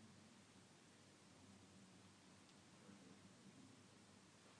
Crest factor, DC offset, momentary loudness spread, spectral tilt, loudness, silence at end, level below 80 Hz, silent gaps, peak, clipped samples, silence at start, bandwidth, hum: 14 dB; under 0.1%; 2 LU; -4 dB/octave; -66 LUFS; 0 s; under -90 dBFS; none; -52 dBFS; under 0.1%; 0 s; 10 kHz; none